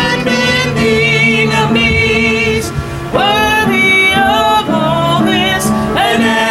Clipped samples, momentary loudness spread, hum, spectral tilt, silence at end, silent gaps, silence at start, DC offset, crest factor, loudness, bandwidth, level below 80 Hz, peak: under 0.1%; 5 LU; none; -4.5 dB/octave; 0 s; none; 0 s; under 0.1%; 12 dB; -10 LUFS; 16.5 kHz; -32 dBFS; 0 dBFS